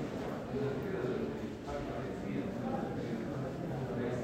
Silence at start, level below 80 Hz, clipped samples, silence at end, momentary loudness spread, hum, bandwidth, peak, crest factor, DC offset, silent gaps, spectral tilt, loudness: 0 s; -56 dBFS; under 0.1%; 0 s; 3 LU; none; 16 kHz; -24 dBFS; 14 dB; under 0.1%; none; -7.5 dB/octave; -38 LUFS